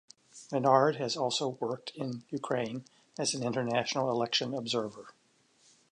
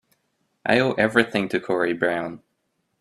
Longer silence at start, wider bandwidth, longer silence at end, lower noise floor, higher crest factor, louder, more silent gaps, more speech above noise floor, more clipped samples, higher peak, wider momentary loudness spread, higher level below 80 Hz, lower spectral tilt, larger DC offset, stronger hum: second, 0.35 s vs 0.65 s; second, 11 kHz vs 13 kHz; first, 0.85 s vs 0.65 s; second, -67 dBFS vs -73 dBFS; about the same, 22 dB vs 24 dB; second, -31 LUFS vs -22 LUFS; neither; second, 35 dB vs 52 dB; neither; second, -10 dBFS vs 0 dBFS; first, 14 LU vs 10 LU; second, -78 dBFS vs -62 dBFS; second, -4 dB/octave vs -6 dB/octave; neither; neither